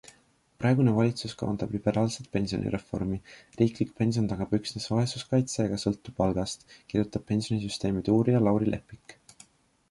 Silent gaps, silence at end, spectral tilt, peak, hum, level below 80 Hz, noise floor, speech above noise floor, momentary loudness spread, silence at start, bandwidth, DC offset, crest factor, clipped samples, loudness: none; 0.8 s; -6.5 dB/octave; -10 dBFS; none; -52 dBFS; -63 dBFS; 36 dB; 9 LU; 0.6 s; 11.5 kHz; under 0.1%; 18 dB; under 0.1%; -28 LUFS